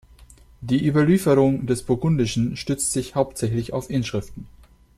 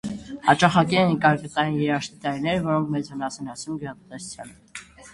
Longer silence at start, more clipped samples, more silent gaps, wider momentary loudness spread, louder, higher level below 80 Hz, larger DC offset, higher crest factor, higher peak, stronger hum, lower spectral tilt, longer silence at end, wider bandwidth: first, 0.2 s vs 0.05 s; neither; neither; second, 10 LU vs 20 LU; about the same, -22 LUFS vs -23 LUFS; first, -46 dBFS vs -56 dBFS; neither; second, 16 dB vs 24 dB; second, -6 dBFS vs 0 dBFS; neither; about the same, -6 dB/octave vs -5.5 dB/octave; first, 0.5 s vs 0.05 s; first, 14.5 kHz vs 11.5 kHz